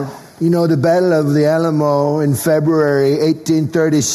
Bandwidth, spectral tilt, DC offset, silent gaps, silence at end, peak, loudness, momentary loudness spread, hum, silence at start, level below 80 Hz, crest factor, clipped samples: 13.5 kHz; -6 dB/octave; under 0.1%; none; 0 s; -4 dBFS; -14 LUFS; 3 LU; none; 0 s; -56 dBFS; 10 dB; under 0.1%